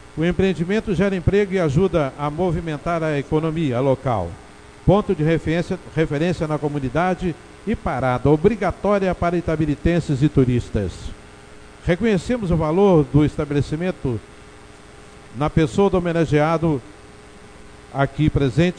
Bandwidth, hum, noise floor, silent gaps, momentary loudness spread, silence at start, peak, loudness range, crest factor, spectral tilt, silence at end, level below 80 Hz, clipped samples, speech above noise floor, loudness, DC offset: 10.5 kHz; none; -43 dBFS; none; 8 LU; 0.15 s; -2 dBFS; 2 LU; 18 dB; -7.5 dB/octave; 0 s; -36 dBFS; under 0.1%; 24 dB; -20 LUFS; under 0.1%